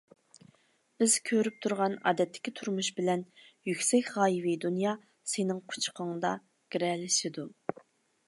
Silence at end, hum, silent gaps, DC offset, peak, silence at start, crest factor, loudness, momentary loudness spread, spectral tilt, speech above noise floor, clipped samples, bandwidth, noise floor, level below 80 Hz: 0.8 s; none; none; under 0.1%; -14 dBFS; 1 s; 18 dB; -31 LUFS; 12 LU; -3.5 dB/octave; 37 dB; under 0.1%; 12 kHz; -67 dBFS; -84 dBFS